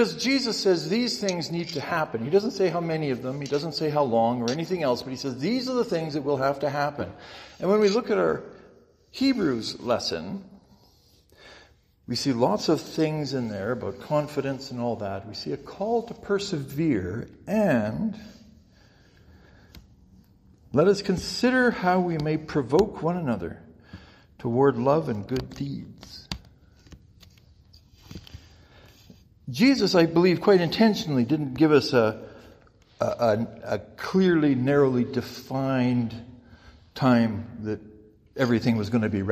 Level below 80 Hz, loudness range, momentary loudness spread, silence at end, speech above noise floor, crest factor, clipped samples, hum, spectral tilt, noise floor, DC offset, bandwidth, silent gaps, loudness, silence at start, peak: -56 dBFS; 7 LU; 14 LU; 0 s; 34 dB; 20 dB; under 0.1%; none; -6 dB/octave; -59 dBFS; under 0.1%; 15 kHz; none; -25 LUFS; 0 s; -6 dBFS